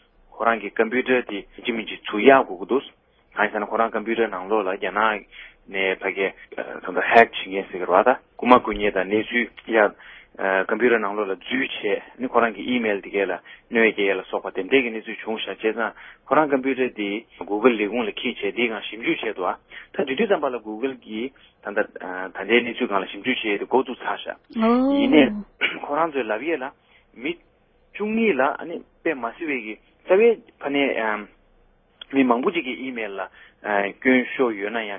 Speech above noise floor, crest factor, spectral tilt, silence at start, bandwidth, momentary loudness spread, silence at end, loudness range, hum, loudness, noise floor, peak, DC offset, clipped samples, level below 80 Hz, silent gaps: 36 dB; 22 dB; -7.5 dB/octave; 0.35 s; 5.4 kHz; 13 LU; 0 s; 5 LU; none; -22 LUFS; -58 dBFS; 0 dBFS; under 0.1%; under 0.1%; -58 dBFS; none